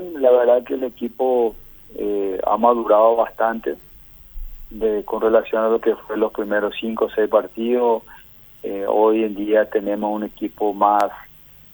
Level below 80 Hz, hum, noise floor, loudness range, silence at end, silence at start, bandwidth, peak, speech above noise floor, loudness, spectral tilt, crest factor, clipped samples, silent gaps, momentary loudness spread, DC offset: -46 dBFS; none; -39 dBFS; 3 LU; 0.5 s; 0 s; over 20 kHz; -2 dBFS; 21 dB; -19 LUFS; -6.5 dB/octave; 18 dB; under 0.1%; none; 13 LU; under 0.1%